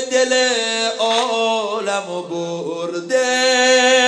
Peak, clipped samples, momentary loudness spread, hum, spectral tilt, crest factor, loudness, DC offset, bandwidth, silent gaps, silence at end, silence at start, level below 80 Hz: -2 dBFS; under 0.1%; 12 LU; none; -1.5 dB/octave; 16 dB; -17 LUFS; under 0.1%; 11 kHz; none; 0 s; 0 s; -80 dBFS